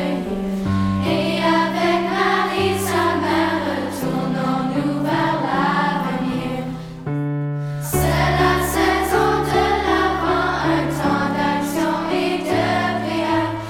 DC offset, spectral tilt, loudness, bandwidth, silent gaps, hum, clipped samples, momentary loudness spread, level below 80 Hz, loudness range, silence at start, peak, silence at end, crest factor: under 0.1%; -5.5 dB/octave; -19 LUFS; 19 kHz; none; none; under 0.1%; 6 LU; -38 dBFS; 3 LU; 0 s; -2 dBFS; 0 s; 16 dB